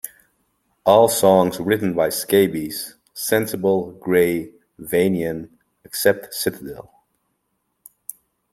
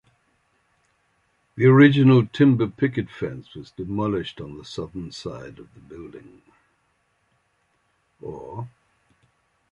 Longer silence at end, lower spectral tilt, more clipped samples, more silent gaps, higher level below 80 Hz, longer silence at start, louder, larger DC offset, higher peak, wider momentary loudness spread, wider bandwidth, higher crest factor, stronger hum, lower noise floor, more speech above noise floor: first, 1.7 s vs 1.05 s; second, -4.5 dB/octave vs -8.5 dB/octave; neither; neither; about the same, -58 dBFS vs -56 dBFS; second, 0.05 s vs 1.55 s; about the same, -19 LUFS vs -20 LUFS; neither; about the same, -2 dBFS vs -2 dBFS; second, 21 LU vs 27 LU; first, 16.5 kHz vs 8 kHz; about the same, 20 dB vs 22 dB; neither; first, -72 dBFS vs -68 dBFS; first, 54 dB vs 47 dB